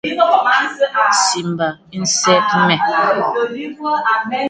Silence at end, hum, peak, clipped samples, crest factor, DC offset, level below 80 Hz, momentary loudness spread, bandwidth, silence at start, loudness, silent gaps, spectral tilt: 0 s; none; 0 dBFS; under 0.1%; 16 dB; under 0.1%; -62 dBFS; 9 LU; 9.6 kHz; 0.05 s; -15 LUFS; none; -3 dB/octave